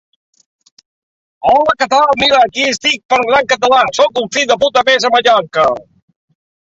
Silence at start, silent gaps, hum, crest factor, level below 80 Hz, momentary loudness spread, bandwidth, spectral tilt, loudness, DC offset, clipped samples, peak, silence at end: 1.45 s; 3.05-3.09 s; none; 14 dB; -52 dBFS; 4 LU; 8 kHz; -2 dB/octave; -11 LUFS; under 0.1%; under 0.1%; 0 dBFS; 0.95 s